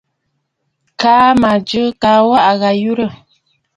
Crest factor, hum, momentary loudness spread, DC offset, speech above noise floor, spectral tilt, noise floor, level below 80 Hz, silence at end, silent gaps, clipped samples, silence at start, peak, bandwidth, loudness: 14 dB; none; 8 LU; under 0.1%; 58 dB; -5.5 dB/octave; -69 dBFS; -48 dBFS; 0.6 s; none; under 0.1%; 1 s; 0 dBFS; 11 kHz; -12 LUFS